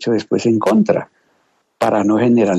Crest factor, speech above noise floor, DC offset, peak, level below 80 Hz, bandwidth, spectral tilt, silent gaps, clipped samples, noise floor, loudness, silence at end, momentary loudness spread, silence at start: 14 dB; 47 dB; under 0.1%; -2 dBFS; -62 dBFS; 12.5 kHz; -7 dB/octave; none; under 0.1%; -62 dBFS; -16 LUFS; 0 s; 5 LU; 0 s